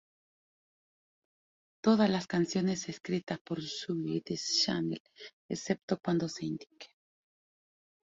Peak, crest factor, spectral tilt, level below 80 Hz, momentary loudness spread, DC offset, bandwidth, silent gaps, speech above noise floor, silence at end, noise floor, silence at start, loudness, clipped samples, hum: -14 dBFS; 22 dB; -5 dB/octave; -72 dBFS; 13 LU; under 0.1%; 7.8 kHz; 3.41-3.45 s, 5.00-5.05 s, 5.33-5.49 s, 5.83-5.88 s; over 58 dB; 1.3 s; under -90 dBFS; 1.85 s; -33 LUFS; under 0.1%; none